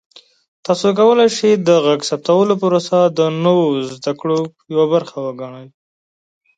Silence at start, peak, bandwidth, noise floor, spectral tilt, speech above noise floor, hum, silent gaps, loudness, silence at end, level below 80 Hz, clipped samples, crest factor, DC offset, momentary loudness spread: 0.7 s; 0 dBFS; 9.2 kHz; under -90 dBFS; -5.5 dB/octave; over 75 dB; none; none; -15 LUFS; 0.9 s; -66 dBFS; under 0.1%; 14 dB; under 0.1%; 13 LU